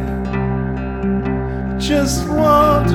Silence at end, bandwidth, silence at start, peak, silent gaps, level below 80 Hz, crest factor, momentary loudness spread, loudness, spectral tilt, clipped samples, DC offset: 0 s; 17.5 kHz; 0 s; -2 dBFS; none; -26 dBFS; 14 dB; 10 LU; -17 LUFS; -6 dB/octave; under 0.1%; under 0.1%